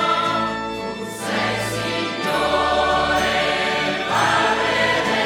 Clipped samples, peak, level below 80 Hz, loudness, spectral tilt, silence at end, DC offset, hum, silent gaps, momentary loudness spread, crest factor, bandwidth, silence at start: under 0.1%; -6 dBFS; -44 dBFS; -20 LUFS; -3.5 dB/octave; 0 s; under 0.1%; none; none; 7 LU; 14 dB; 19.5 kHz; 0 s